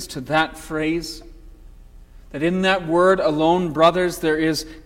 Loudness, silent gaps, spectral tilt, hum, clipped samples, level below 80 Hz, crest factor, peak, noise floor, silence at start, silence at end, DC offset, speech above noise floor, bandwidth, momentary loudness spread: -19 LUFS; none; -5 dB/octave; 60 Hz at -45 dBFS; under 0.1%; -44 dBFS; 18 dB; -2 dBFS; -43 dBFS; 0 s; 0.05 s; under 0.1%; 24 dB; 16.5 kHz; 9 LU